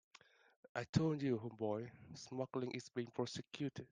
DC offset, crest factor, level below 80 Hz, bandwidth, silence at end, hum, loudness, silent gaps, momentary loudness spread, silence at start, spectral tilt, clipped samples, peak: under 0.1%; 24 dB; -74 dBFS; 9.8 kHz; 0.05 s; none; -43 LUFS; 0.89-0.93 s; 11 LU; 0.75 s; -6.5 dB/octave; under 0.1%; -20 dBFS